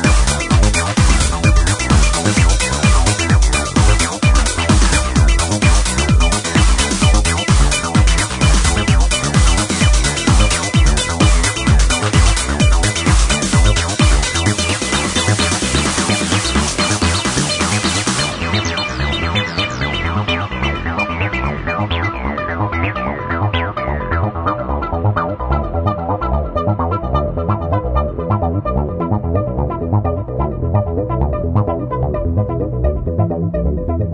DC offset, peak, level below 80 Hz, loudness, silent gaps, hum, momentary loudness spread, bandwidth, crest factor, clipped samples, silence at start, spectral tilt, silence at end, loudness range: under 0.1%; 0 dBFS; -18 dBFS; -15 LUFS; none; none; 6 LU; 11 kHz; 14 dB; under 0.1%; 0 s; -4 dB/octave; 0 s; 5 LU